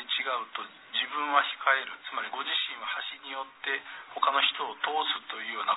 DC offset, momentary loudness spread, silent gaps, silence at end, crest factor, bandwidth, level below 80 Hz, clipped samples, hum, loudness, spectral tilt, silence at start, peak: under 0.1%; 11 LU; none; 0 s; 22 dB; 4.1 kHz; -84 dBFS; under 0.1%; none; -30 LUFS; -2.5 dB/octave; 0 s; -8 dBFS